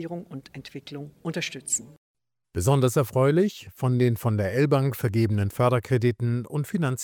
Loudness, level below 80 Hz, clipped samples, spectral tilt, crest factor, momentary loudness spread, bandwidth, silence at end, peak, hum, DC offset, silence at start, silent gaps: -24 LUFS; -58 dBFS; under 0.1%; -6 dB/octave; 16 dB; 16 LU; 20 kHz; 0 s; -8 dBFS; none; under 0.1%; 0 s; 1.98-2.15 s